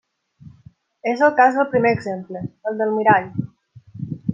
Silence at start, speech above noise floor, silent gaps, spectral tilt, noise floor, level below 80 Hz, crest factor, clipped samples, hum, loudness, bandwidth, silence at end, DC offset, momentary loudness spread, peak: 0.45 s; 32 dB; none; -7.5 dB/octave; -50 dBFS; -60 dBFS; 18 dB; under 0.1%; none; -19 LUFS; 7.6 kHz; 0 s; under 0.1%; 17 LU; -2 dBFS